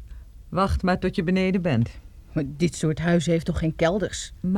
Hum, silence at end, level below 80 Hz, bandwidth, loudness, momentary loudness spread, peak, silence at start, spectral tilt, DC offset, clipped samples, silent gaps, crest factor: none; 0 s; -38 dBFS; 12 kHz; -24 LUFS; 8 LU; -8 dBFS; 0 s; -6.5 dB/octave; under 0.1%; under 0.1%; none; 16 dB